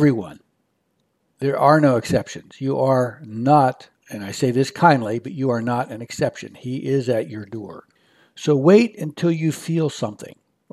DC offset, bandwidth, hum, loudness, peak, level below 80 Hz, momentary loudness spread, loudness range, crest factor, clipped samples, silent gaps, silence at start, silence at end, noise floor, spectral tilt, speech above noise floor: under 0.1%; 13.5 kHz; none; -20 LUFS; 0 dBFS; -60 dBFS; 18 LU; 4 LU; 20 dB; under 0.1%; none; 0 s; 0.4 s; -69 dBFS; -6.5 dB/octave; 50 dB